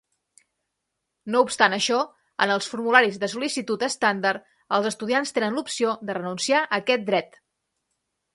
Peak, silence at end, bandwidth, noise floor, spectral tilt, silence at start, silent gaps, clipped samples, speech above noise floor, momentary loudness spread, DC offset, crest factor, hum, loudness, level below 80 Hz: 0 dBFS; 1.1 s; 11.5 kHz; -80 dBFS; -3 dB/octave; 1.25 s; none; under 0.1%; 57 dB; 8 LU; under 0.1%; 24 dB; none; -23 LUFS; -74 dBFS